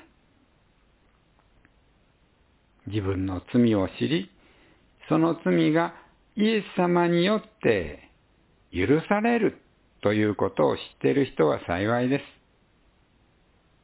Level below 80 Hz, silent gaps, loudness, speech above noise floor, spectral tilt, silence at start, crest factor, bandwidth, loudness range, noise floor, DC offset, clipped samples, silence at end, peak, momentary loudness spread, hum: -52 dBFS; none; -25 LUFS; 39 dB; -11 dB/octave; 2.85 s; 20 dB; 4 kHz; 5 LU; -63 dBFS; under 0.1%; under 0.1%; 1.55 s; -8 dBFS; 8 LU; none